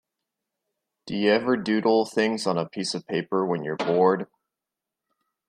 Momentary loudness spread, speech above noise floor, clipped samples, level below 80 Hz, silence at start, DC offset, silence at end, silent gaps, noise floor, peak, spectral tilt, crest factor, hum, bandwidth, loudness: 8 LU; 64 dB; under 0.1%; -72 dBFS; 1.05 s; under 0.1%; 1.25 s; none; -87 dBFS; -8 dBFS; -5.5 dB/octave; 18 dB; none; 12 kHz; -24 LUFS